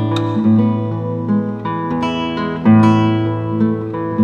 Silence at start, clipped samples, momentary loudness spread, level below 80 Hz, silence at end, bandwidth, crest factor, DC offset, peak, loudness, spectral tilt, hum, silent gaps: 0 s; under 0.1%; 10 LU; -48 dBFS; 0 s; 7 kHz; 14 dB; under 0.1%; 0 dBFS; -16 LUFS; -8.5 dB/octave; none; none